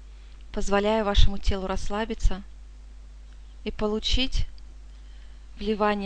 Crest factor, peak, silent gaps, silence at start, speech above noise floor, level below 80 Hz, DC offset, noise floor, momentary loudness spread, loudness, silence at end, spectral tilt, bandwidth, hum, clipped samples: 22 dB; -4 dBFS; none; 0 s; 21 dB; -30 dBFS; under 0.1%; -44 dBFS; 25 LU; -27 LUFS; 0 s; -5 dB/octave; 8.8 kHz; none; under 0.1%